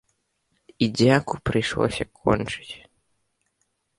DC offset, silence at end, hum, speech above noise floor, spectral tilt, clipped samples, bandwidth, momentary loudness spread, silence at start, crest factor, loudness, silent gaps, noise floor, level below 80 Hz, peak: under 0.1%; 1.2 s; none; 51 dB; -6 dB/octave; under 0.1%; 11.5 kHz; 15 LU; 0.8 s; 22 dB; -23 LUFS; none; -73 dBFS; -48 dBFS; -4 dBFS